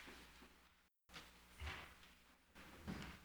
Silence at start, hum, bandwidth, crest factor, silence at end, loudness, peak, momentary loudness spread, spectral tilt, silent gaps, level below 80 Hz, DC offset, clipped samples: 0 s; none; over 20 kHz; 20 dB; 0 s; -57 LUFS; -36 dBFS; 14 LU; -4.5 dB/octave; none; -64 dBFS; under 0.1%; under 0.1%